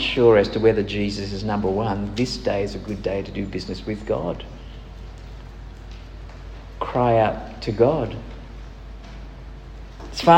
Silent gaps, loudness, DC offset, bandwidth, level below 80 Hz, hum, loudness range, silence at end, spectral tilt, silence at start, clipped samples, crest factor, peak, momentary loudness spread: none; -22 LUFS; under 0.1%; 9.6 kHz; -38 dBFS; none; 8 LU; 0 s; -6.5 dB/octave; 0 s; under 0.1%; 22 dB; -2 dBFS; 22 LU